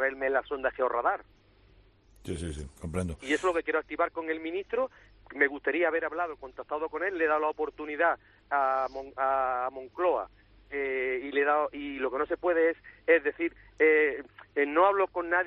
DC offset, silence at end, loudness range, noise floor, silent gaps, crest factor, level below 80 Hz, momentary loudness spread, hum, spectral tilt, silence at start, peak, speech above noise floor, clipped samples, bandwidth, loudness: under 0.1%; 0 s; 6 LU; -60 dBFS; none; 20 dB; -56 dBFS; 12 LU; none; -5.5 dB/octave; 0 s; -10 dBFS; 31 dB; under 0.1%; 11 kHz; -29 LUFS